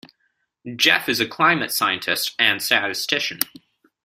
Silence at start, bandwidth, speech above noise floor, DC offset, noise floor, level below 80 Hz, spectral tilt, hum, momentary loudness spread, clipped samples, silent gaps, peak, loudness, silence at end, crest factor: 0.65 s; 16 kHz; 49 dB; under 0.1%; -70 dBFS; -64 dBFS; -1.5 dB/octave; none; 7 LU; under 0.1%; none; 0 dBFS; -19 LUFS; 0.6 s; 22 dB